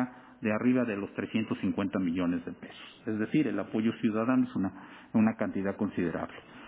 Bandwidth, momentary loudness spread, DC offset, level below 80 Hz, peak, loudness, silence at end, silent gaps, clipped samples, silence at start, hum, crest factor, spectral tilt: 4 kHz; 10 LU; under 0.1%; -62 dBFS; -12 dBFS; -31 LUFS; 0 s; none; under 0.1%; 0 s; none; 18 dB; -6.5 dB/octave